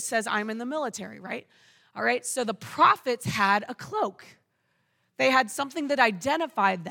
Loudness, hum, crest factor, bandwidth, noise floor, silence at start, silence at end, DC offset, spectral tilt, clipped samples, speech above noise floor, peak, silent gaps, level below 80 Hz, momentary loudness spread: -26 LUFS; none; 20 dB; 19 kHz; -73 dBFS; 0 s; 0 s; under 0.1%; -3.5 dB/octave; under 0.1%; 46 dB; -8 dBFS; none; -72 dBFS; 13 LU